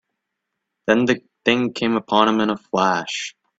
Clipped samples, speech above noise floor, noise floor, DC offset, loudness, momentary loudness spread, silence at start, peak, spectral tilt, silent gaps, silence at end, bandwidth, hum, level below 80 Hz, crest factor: under 0.1%; 60 dB; -79 dBFS; under 0.1%; -20 LUFS; 10 LU; 0.85 s; 0 dBFS; -4.5 dB/octave; none; 0.3 s; 8 kHz; none; -62 dBFS; 20 dB